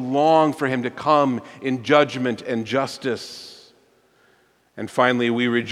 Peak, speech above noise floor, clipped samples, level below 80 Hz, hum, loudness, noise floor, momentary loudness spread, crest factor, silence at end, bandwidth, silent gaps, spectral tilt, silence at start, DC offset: -2 dBFS; 39 dB; under 0.1%; -68 dBFS; none; -21 LUFS; -60 dBFS; 12 LU; 20 dB; 0 s; 13 kHz; none; -5.5 dB/octave; 0 s; under 0.1%